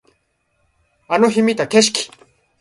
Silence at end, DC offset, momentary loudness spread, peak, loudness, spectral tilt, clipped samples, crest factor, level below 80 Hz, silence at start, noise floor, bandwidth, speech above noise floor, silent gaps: 0.55 s; under 0.1%; 9 LU; 0 dBFS; -16 LUFS; -3 dB/octave; under 0.1%; 18 dB; -62 dBFS; 1.1 s; -66 dBFS; 11.5 kHz; 51 dB; none